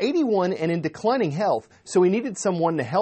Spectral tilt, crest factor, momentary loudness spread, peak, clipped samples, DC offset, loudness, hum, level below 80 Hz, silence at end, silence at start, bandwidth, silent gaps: -6 dB/octave; 14 dB; 5 LU; -8 dBFS; under 0.1%; under 0.1%; -23 LUFS; none; -68 dBFS; 0 s; 0 s; 8.8 kHz; none